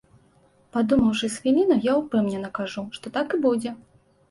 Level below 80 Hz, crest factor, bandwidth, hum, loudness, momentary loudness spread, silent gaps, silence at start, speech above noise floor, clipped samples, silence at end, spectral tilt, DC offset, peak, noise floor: -54 dBFS; 14 dB; 11.5 kHz; none; -23 LUFS; 11 LU; none; 0.75 s; 37 dB; under 0.1%; 0.55 s; -5.5 dB/octave; under 0.1%; -10 dBFS; -59 dBFS